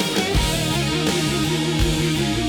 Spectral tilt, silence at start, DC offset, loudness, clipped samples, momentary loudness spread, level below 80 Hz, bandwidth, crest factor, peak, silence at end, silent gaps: -4.5 dB/octave; 0 s; under 0.1%; -20 LUFS; under 0.1%; 1 LU; -30 dBFS; over 20 kHz; 14 dB; -6 dBFS; 0 s; none